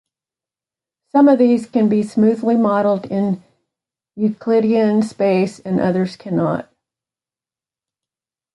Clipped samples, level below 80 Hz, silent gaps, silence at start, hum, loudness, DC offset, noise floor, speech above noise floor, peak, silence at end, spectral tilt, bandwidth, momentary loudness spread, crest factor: under 0.1%; -62 dBFS; none; 1.15 s; none; -17 LUFS; under 0.1%; under -90 dBFS; over 74 dB; -2 dBFS; 1.95 s; -8 dB/octave; 11.5 kHz; 8 LU; 16 dB